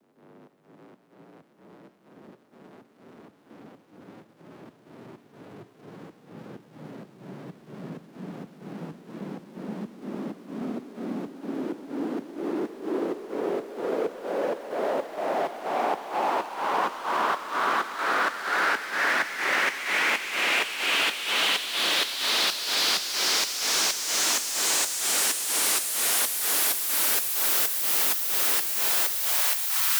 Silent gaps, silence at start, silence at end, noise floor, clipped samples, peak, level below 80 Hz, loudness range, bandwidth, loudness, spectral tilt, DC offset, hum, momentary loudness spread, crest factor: none; 0.35 s; 0 s; -54 dBFS; under 0.1%; -12 dBFS; -80 dBFS; 20 LU; over 20 kHz; -24 LUFS; -0.5 dB/octave; under 0.1%; none; 19 LU; 18 dB